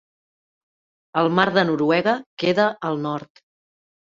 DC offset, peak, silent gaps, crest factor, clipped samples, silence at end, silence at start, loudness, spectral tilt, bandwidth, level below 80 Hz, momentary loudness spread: under 0.1%; -2 dBFS; 2.26-2.37 s; 22 dB; under 0.1%; 0.9 s; 1.15 s; -21 LUFS; -6.5 dB/octave; 7.6 kHz; -66 dBFS; 9 LU